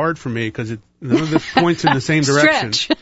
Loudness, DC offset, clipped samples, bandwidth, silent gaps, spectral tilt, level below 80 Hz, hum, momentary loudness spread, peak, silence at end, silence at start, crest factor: -16 LUFS; under 0.1%; under 0.1%; 8 kHz; none; -4.5 dB/octave; -50 dBFS; none; 12 LU; 0 dBFS; 0.05 s; 0 s; 18 dB